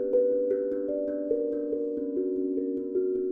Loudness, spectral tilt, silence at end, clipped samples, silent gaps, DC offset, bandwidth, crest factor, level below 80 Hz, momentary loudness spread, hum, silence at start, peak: -29 LUFS; -10.5 dB/octave; 0 s; under 0.1%; none; under 0.1%; 2.1 kHz; 12 dB; -64 dBFS; 5 LU; none; 0 s; -14 dBFS